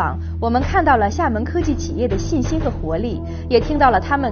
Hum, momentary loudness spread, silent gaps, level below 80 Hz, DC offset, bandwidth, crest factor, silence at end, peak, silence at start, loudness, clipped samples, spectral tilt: none; 8 LU; none; -28 dBFS; under 0.1%; 6.8 kHz; 18 dB; 0 s; 0 dBFS; 0 s; -19 LUFS; under 0.1%; -5.5 dB/octave